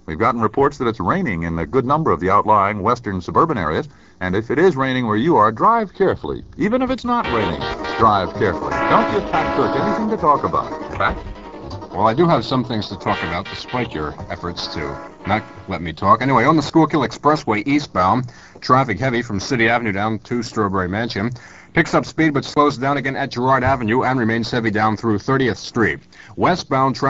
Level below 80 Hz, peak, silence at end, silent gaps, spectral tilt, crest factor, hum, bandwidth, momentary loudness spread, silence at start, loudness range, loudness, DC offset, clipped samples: -42 dBFS; 0 dBFS; 0 s; none; -6.5 dB/octave; 18 dB; none; 8 kHz; 10 LU; 0.1 s; 3 LU; -18 LUFS; 0.3%; under 0.1%